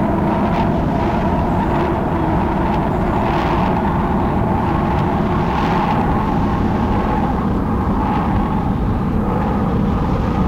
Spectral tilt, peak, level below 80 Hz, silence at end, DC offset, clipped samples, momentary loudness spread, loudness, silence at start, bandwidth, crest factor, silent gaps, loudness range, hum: -8.5 dB/octave; -6 dBFS; -26 dBFS; 0 s; 0.2%; under 0.1%; 2 LU; -17 LUFS; 0 s; 13.5 kHz; 10 dB; none; 1 LU; none